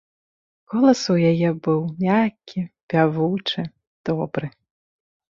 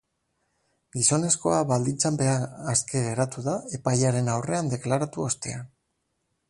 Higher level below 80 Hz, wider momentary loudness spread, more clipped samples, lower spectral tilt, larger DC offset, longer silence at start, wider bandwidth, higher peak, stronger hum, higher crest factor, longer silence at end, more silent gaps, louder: about the same, -62 dBFS vs -60 dBFS; first, 13 LU vs 8 LU; neither; first, -6.5 dB/octave vs -4.5 dB/octave; neither; second, 0.7 s vs 0.95 s; second, 7.6 kHz vs 11.5 kHz; first, -4 dBFS vs -8 dBFS; neither; about the same, 18 dB vs 18 dB; about the same, 0.9 s vs 0.85 s; first, 2.83-2.88 s, 3.87-4.04 s vs none; first, -21 LUFS vs -25 LUFS